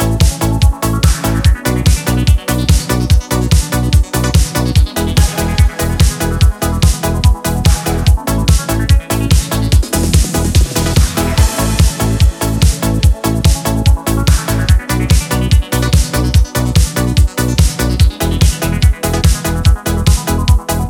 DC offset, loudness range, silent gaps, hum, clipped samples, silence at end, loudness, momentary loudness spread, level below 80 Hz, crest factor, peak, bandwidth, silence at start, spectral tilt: under 0.1%; 0 LU; none; none; under 0.1%; 0 s; -13 LUFS; 1 LU; -14 dBFS; 12 dB; 0 dBFS; 18 kHz; 0 s; -5 dB/octave